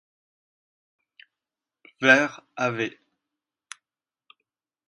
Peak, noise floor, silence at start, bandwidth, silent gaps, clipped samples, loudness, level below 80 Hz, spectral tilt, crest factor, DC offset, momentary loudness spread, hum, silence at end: -2 dBFS; under -90 dBFS; 2 s; 11.5 kHz; none; under 0.1%; -22 LUFS; -80 dBFS; -4 dB/octave; 28 dB; under 0.1%; 27 LU; none; 2 s